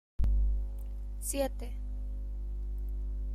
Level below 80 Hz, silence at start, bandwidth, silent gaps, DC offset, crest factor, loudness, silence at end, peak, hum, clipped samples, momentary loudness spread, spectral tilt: -34 dBFS; 0.2 s; 15 kHz; none; under 0.1%; 14 dB; -37 LUFS; 0 s; -18 dBFS; 50 Hz at -35 dBFS; under 0.1%; 9 LU; -5.5 dB/octave